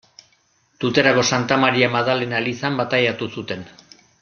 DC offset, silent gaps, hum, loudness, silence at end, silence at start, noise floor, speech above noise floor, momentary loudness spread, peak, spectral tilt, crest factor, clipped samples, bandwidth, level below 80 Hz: under 0.1%; none; none; -19 LUFS; 0.5 s; 0.8 s; -62 dBFS; 42 dB; 12 LU; -2 dBFS; -4.5 dB/octave; 20 dB; under 0.1%; 7.2 kHz; -60 dBFS